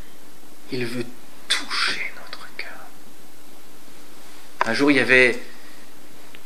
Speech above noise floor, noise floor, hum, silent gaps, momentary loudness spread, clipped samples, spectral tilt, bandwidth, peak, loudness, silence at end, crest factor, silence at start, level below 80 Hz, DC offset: 27 dB; -48 dBFS; none; none; 22 LU; under 0.1%; -3.5 dB/octave; 16 kHz; 0 dBFS; -20 LUFS; 0.95 s; 26 dB; 0.7 s; -70 dBFS; 5%